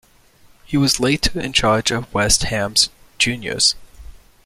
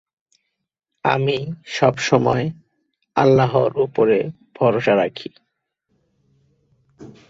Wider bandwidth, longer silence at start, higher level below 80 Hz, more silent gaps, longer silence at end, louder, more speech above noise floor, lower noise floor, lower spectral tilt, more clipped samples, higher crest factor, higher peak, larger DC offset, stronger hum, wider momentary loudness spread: first, 16 kHz vs 7.8 kHz; second, 0.7 s vs 1.05 s; first, -36 dBFS vs -56 dBFS; neither; about the same, 0.35 s vs 0.25 s; about the same, -17 LUFS vs -19 LUFS; second, 33 dB vs 60 dB; second, -51 dBFS vs -78 dBFS; second, -2.5 dB/octave vs -6 dB/octave; neither; about the same, 20 dB vs 18 dB; about the same, 0 dBFS vs -2 dBFS; neither; neither; second, 4 LU vs 11 LU